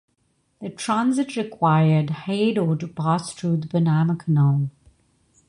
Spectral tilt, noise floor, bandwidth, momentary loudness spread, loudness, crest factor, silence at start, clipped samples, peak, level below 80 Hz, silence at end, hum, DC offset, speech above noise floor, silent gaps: -7 dB/octave; -68 dBFS; 11 kHz; 8 LU; -22 LUFS; 16 dB; 0.6 s; under 0.1%; -6 dBFS; -58 dBFS; 0.8 s; none; under 0.1%; 47 dB; none